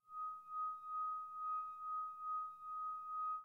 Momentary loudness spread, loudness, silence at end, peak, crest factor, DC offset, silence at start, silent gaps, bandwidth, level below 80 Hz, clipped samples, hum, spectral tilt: 3 LU; -44 LUFS; 0 s; -36 dBFS; 8 dB; under 0.1%; 0.05 s; none; 4 kHz; under -90 dBFS; under 0.1%; none; -3 dB/octave